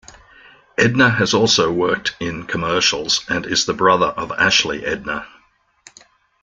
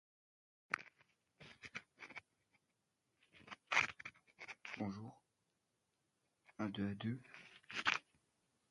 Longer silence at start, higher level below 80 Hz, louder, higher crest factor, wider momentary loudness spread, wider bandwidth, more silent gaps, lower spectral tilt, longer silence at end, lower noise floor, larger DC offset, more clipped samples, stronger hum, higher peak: about the same, 0.8 s vs 0.7 s; first, -50 dBFS vs -78 dBFS; first, -17 LUFS vs -43 LUFS; second, 18 dB vs 32 dB; second, 10 LU vs 21 LU; second, 10 kHz vs 11.5 kHz; neither; about the same, -3 dB/octave vs -4 dB/octave; first, 1.15 s vs 0.7 s; second, -57 dBFS vs -86 dBFS; neither; neither; neither; first, -2 dBFS vs -16 dBFS